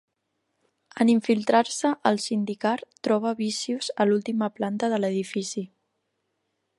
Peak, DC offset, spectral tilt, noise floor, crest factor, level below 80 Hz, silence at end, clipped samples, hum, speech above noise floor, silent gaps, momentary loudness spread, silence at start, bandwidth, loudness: -6 dBFS; under 0.1%; -4.5 dB/octave; -77 dBFS; 20 dB; -76 dBFS; 1.15 s; under 0.1%; none; 53 dB; none; 8 LU; 0.95 s; 11.5 kHz; -25 LUFS